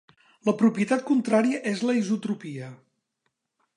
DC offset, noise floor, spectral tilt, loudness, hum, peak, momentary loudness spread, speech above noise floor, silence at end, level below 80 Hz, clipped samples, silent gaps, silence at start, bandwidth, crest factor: under 0.1%; -78 dBFS; -6 dB/octave; -25 LUFS; none; -8 dBFS; 13 LU; 54 dB; 1 s; -78 dBFS; under 0.1%; none; 0.45 s; 11 kHz; 18 dB